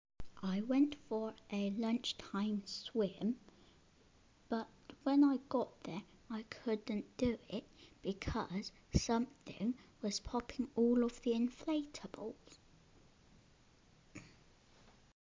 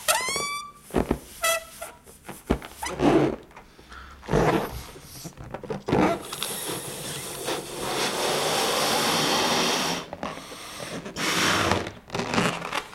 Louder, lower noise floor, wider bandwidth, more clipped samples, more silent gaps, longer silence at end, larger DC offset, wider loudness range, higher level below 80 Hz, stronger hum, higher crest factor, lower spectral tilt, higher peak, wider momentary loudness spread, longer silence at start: second, -39 LUFS vs -26 LUFS; first, -68 dBFS vs -48 dBFS; second, 7.6 kHz vs 16.5 kHz; neither; neither; first, 1 s vs 0 s; neither; about the same, 5 LU vs 4 LU; second, -58 dBFS vs -46 dBFS; neither; about the same, 22 dB vs 24 dB; first, -5.5 dB/octave vs -3 dB/octave; second, -16 dBFS vs -4 dBFS; second, 14 LU vs 18 LU; first, 0.2 s vs 0 s